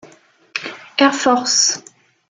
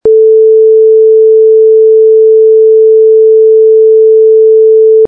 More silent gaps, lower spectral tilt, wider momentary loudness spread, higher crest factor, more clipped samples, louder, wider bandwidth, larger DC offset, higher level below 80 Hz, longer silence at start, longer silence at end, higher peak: neither; second, -0.5 dB/octave vs -11 dB/octave; first, 14 LU vs 0 LU; first, 18 dB vs 4 dB; neither; second, -16 LUFS vs -4 LUFS; first, 11 kHz vs 0.8 kHz; neither; second, -66 dBFS vs -54 dBFS; first, 0.55 s vs 0.05 s; first, 0.5 s vs 0 s; about the same, -2 dBFS vs 0 dBFS